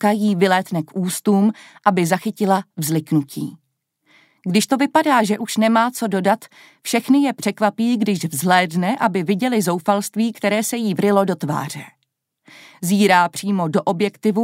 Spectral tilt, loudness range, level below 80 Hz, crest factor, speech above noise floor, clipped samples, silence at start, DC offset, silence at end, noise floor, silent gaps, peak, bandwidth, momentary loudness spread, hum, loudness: -5 dB/octave; 2 LU; -70 dBFS; 18 dB; 54 dB; under 0.1%; 0 s; under 0.1%; 0 s; -73 dBFS; none; 0 dBFS; 16 kHz; 7 LU; none; -19 LUFS